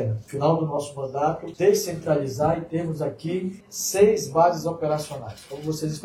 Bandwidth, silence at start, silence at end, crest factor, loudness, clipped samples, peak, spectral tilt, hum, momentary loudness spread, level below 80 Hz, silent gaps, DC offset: 16 kHz; 0 s; 0 s; 18 dB; -24 LUFS; under 0.1%; -4 dBFS; -5.5 dB/octave; none; 11 LU; -56 dBFS; none; under 0.1%